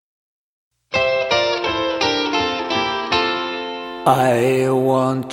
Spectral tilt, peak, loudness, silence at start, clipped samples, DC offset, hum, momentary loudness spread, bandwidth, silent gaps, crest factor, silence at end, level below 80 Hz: -4.5 dB/octave; 0 dBFS; -18 LUFS; 0.9 s; under 0.1%; under 0.1%; none; 6 LU; 16.5 kHz; none; 18 dB; 0 s; -50 dBFS